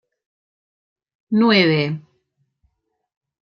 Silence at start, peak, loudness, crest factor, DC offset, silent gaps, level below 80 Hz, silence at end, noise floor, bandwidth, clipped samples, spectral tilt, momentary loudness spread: 1.3 s; -2 dBFS; -17 LUFS; 20 dB; under 0.1%; none; -68 dBFS; 1.4 s; -69 dBFS; 6.4 kHz; under 0.1%; -7 dB/octave; 12 LU